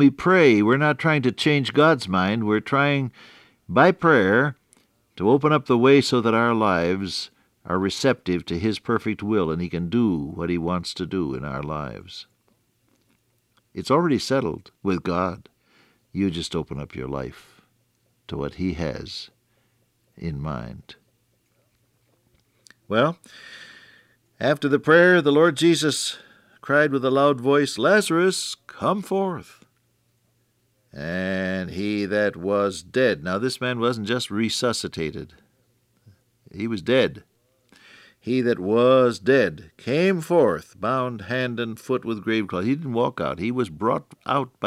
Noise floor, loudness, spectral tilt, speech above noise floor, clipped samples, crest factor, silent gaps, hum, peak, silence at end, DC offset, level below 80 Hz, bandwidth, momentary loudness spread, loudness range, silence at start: -67 dBFS; -22 LUFS; -5.5 dB/octave; 45 dB; under 0.1%; 20 dB; none; none; -4 dBFS; 0 s; under 0.1%; -54 dBFS; 15.5 kHz; 15 LU; 12 LU; 0 s